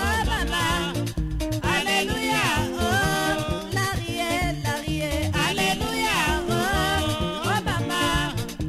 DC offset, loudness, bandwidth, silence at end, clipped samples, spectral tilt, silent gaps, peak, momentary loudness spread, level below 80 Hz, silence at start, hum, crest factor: under 0.1%; -24 LUFS; 16 kHz; 0 s; under 0.1%; -4 dB/octave; none; -10 dBFS; 5 LU; -34 dBFS; 0 s; none; 14 dB